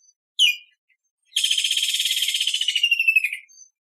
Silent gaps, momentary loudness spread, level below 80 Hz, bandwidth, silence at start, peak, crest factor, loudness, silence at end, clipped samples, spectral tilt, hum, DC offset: 0.78-0.88 s, 1.11-1.18 s; 11 LU; under -90 dBFS; 15.5 kHz; 0.4 s; -6 dBFS; 18 dB; -19 LUFS; 0.6 s; under 0.1%; 15 dB/octave; none; under 0.1%